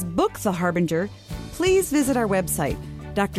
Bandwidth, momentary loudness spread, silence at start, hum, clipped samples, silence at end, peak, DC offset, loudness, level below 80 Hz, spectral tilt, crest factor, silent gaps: 15 kHz; 12 LU; 0 s; none; under 0.1%; 0 s; -8 dBFS; under 0.1%; -23 LUFS; -42 dBFS; -5 dB/octave; 16 dB; none